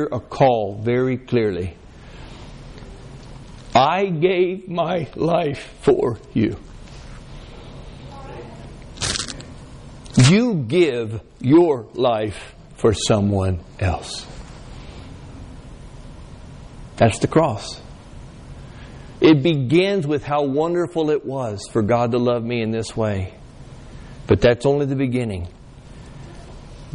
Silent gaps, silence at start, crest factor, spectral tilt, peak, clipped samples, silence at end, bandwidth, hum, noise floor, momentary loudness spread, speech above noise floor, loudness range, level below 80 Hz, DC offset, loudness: none; 0 s; 18 dB; -6 dB/octave; -4 dBFS; under 0.1%; 0.05 s; 10.5 kHz; none; -40 dBFS; 24 LU; 22 dB; 8 LU; -42 dBFS; under 0.1%; -19 LUFS